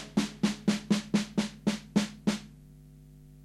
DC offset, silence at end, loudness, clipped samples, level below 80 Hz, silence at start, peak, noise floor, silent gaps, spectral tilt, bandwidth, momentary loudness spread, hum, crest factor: under 0.1%; 0.2 s; -31 LUFS; under 0.1%; -58 dBFS; 0 s; -12 dBFS; -52 dBFS; none; -5 dB/octave; 13 kHz; 5 LU; none; 20 dB